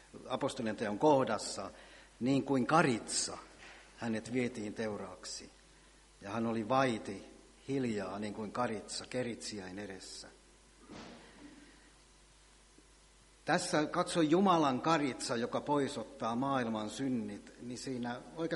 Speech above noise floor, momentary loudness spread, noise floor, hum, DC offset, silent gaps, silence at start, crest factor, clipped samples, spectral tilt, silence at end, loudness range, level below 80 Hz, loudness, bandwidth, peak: 28 dB; 22 LU; -63 dBFS; none; under 0.1%; none; 0.15 s; 24 dB; under 0.1%; -4.5 dB/octave; 0 s; 12 LU; -66 dBFS; -35 LUFS; 11.5 kHz; -12 dBFS